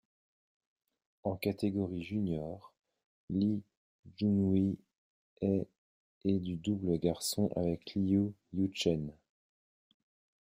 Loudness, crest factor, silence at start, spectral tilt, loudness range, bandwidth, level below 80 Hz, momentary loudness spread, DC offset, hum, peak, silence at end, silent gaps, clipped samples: -34 LUFS; 18 dB; 1.25 s; -6.5 dB/octave; 3 LU; 15.5 kHz; -66 dBFS; 9 LU; under 0.1%; none; -16 dBFS; 1.35 s; 3.04-3.28 s, 3.77-4.03 s, 4.98-5.37 s, 5.78-6.21 s; under 0.1%